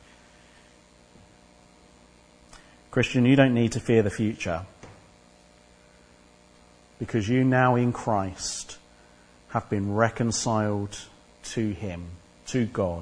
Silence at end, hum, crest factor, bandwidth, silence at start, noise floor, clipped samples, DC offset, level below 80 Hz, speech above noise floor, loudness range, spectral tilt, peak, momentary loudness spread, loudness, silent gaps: 0 s; 60 Hz at -50 dBFS; 24 dB; 10.5 kHz; 2.5 s; -55 dBFS; under 0.1%; under 0.1%; -54 dBFS; 31 dB; 6 LU; -5.5 dB/octave; -4 dBFS; 20 LU; -25 LUFS; none